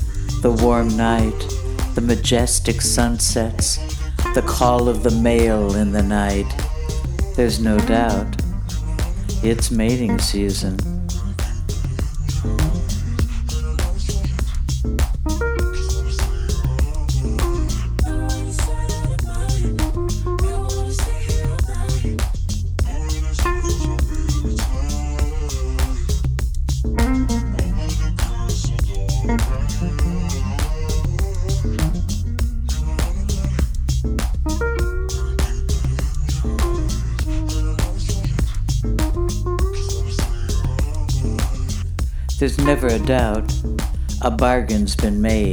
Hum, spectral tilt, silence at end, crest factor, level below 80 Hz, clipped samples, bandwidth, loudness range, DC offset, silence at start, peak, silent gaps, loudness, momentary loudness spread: none; -5.5 dB/octave; 0 s; 18 dB; -22 dBFS; under 0.1%; over 20 kHz; 4 LU; under 0.1%; 0 s; 0 dBFS; none; -21 LUFS; 7 LU